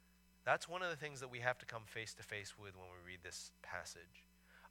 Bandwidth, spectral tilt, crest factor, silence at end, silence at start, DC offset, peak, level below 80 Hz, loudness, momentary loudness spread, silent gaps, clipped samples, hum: 18 kHz; -3 dB/octave; 26 dB; 0 s; 0.45 s; under 0.1%; -20 dBFS; -74 dBFS; -45 LUFS; 17 LU; none; under 0.1%; none